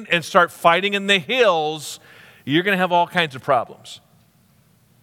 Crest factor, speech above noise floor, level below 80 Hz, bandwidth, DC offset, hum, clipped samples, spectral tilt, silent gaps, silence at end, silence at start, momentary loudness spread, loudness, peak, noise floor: 20 dB; 38 dB; -72 dBFS; 17.5 kHz; under 0.1%; none; under 0.1%; -4 dB/octave; none; 1.05 s; 0 s; 18 LU; -18 LUFS; 0 dBFS; -57 dBFS